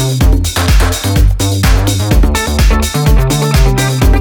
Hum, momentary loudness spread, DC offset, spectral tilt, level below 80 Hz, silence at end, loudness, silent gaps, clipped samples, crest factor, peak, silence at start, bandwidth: none; 1 LU; under 0.1%; -5 dB/octave; -12 dBFS; 0 s; -11 LUFS; none; under 0.1%; 10 dB; 0 dBFS; 0 s; 19.5 kHz